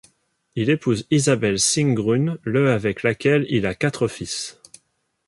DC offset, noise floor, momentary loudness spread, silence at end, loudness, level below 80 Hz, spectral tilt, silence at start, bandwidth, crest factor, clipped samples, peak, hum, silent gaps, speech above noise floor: under 0.1%; -68 dBFS; 9 LU; 0.75 s; -20 LUFS; -52 dBFS; -5 dB/octave; 0.55 s; 11.5 kHz; 16 dB; under 0.1%; -4 dBFS; none; none; 48 dB